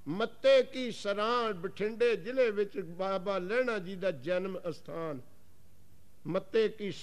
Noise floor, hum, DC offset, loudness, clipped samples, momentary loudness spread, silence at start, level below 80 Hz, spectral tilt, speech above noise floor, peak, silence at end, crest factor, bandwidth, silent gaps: -63 dBFS; none; 0.5%; -32 LUFS; under 0.1%; 13 LU; 0.05 s; -70 dBFS; -5.5 dB/octave; 32 dB; -16 dBFS; 0 s; 16 dB; 13.5 kHz; none